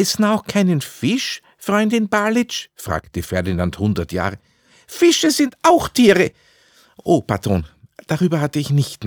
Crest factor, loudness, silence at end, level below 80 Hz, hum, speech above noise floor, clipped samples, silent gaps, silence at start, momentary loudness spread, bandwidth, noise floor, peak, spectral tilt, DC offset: 16 dB; -18 LUFS; 0 s; -48 dBFS; none; 36 dB; under 0.1%; none; 0 s; 12 LU; over 20 kHz; -53 dBFS; -2 dBFS; -5 dB/octave; under 0.1%